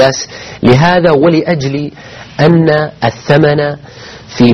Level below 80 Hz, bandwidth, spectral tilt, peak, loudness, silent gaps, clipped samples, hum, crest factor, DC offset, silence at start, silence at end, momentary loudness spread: -40 dBFS; 7.2 kHz; -6 dB/octave; 0 dBFS; -10 LUFS; none; 0.6%; none; 10 dB; under 0.1%; 0 s; 0 s; 19 LU